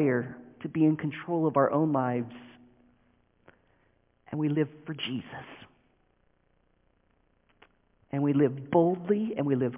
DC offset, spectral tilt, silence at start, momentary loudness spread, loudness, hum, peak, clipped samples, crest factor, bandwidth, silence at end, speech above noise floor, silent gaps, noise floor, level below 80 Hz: under 0.1%; -6.5 dB/octave; 0 s; 16 LU; -28 LUFS; none; -10 dBFS; under 0.1%; 20 dB; 3.8 kHz; 0 s; 42 dB; none; -69 dBFS; -70 dBFS